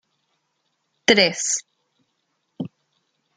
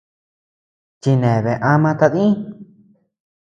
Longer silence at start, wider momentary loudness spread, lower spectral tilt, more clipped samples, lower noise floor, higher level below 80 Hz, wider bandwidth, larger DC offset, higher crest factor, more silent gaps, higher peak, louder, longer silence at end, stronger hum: about the same, 1.1 s vs 1.05 s; first, 20 LU vs 9 LU; second, -2 dB/octave vs -8.5 dB/octave; neither; first, -73 dBFS vs -53 dBFS; second, -68 dBFS vs -54 dBFS; first, 10 kHz vs 7.6 kHz; neither; first, 26 dB vs 18 dB; neither; about the same, 0 dBFS vs 0 dBFS; about the same, -19 LUFS vs -17 LUFS; second, 0.7 s vs 0.9 s; neither